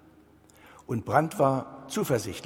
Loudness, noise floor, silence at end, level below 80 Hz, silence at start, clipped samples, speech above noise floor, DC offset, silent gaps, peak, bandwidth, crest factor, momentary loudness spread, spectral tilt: -28 LUFS; -57 dBFS; 0 s; -60 dBFS; 0.9 s; under 0.1%; 30 dB; under 0.1%; none; -6 dBFS; 17 kHz; 24 dB; 10 LU; -6 dB/octave